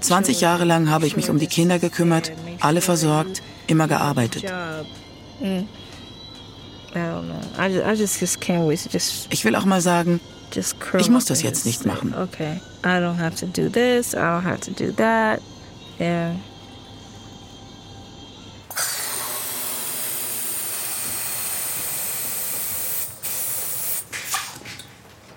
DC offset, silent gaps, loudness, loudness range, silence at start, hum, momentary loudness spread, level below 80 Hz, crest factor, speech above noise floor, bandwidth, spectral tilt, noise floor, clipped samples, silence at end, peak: under 0.1%; none; -22 LUFS; 8 LU; 0 s; none; 22 LU; -56 dBFS; 20 dB; 25 dB; 17 kHz; -4 dB/octave; -46 dBFS; under 0.1%; 0 s; -4 dBFS